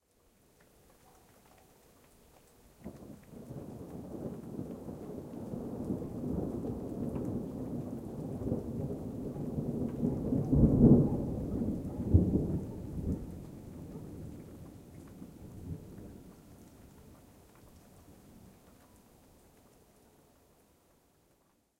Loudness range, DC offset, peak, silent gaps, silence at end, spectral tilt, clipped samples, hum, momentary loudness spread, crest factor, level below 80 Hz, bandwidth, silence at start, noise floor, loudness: 22 LU; under 0.1%; -10 dBFS; none; 3.1 s; -10 dB/octave; under 0.1%; none; 23 LU; 26 dB; -46 dBFS; 16 kHz; 2.8 s; -71 dBFS; -34 LUFS